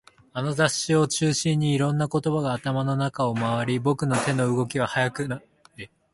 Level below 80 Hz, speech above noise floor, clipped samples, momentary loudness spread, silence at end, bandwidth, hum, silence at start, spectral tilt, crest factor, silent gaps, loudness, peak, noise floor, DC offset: -58 dBFS; 21 dB; under 0.1%; 9 LU; 0.3 s; 11.5 kHz; none; 0.35 s; -5 dB/octave; 18 dB; none; -24 LUFS; -6 dBFS; -45 dBFS; under 0.1%